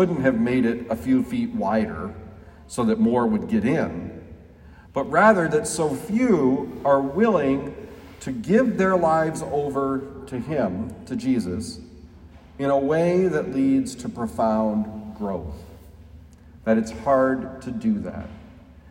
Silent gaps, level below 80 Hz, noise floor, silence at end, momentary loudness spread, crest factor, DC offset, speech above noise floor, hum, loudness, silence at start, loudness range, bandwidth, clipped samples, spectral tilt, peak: none; -50 dBFS; -47 dBFS; 0 s; 14 LU; 20 dB; under 0.1%; 25 dB; none; -23 LUFS; 0 s; 5 LU; 16 kHz; under 0.1%; -6.5 dB/octave; -2 dBFS